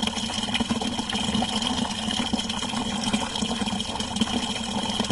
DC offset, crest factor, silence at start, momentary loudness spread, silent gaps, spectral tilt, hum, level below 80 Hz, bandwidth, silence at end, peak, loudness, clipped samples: under 0.1%; 18 dB; 0 s; 3 LU; none; -3 dB/octave; none; -44 dBFS; 11.5 kHz; 0 s; -8 dBFS; -26 LUFS; under 0.1%